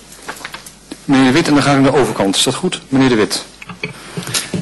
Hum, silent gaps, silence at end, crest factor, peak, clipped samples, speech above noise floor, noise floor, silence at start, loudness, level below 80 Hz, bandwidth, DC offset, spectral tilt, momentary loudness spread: none; none; 0 s; 12 dB; -4 dBFS; under 0.1%; 22 dB; -35 dBFS; 0.1 s; -13 LUFS; -44 dBFS; 12.5 kHz; under 0.1%; -4.5 dB/octave; 19 LU